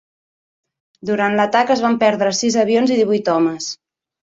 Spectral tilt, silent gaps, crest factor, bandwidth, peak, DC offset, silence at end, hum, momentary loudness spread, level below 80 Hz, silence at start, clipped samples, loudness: -4 dB/octave; none; 16 dB; 8 kHz; -2 dBFS; under 0.1%; 0.55 s; none; 11 LU; -62 dBFS; 1.05 s; under 0.1%; -16 LUFS